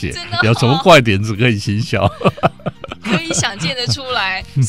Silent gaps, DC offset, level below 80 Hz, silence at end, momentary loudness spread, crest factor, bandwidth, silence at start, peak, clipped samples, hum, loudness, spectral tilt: none; 0.8%; -40 dBFS; 0 s; 10 LU; 16 dB; 15.5 kHz; 0 s; 0 dBFS; under 0.1%; none; -15 LUFS; -4.5 dB/octave